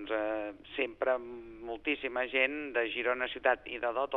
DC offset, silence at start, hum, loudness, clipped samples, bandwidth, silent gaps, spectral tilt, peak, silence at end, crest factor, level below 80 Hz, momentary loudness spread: under 0.1%; 0 s; none; -33 LUFS; under 0.1%; 4.3 kHz; none; -6 dB/octave; -12 dBFS; 0 s; 22 dB; -64 dBFS; 9 LU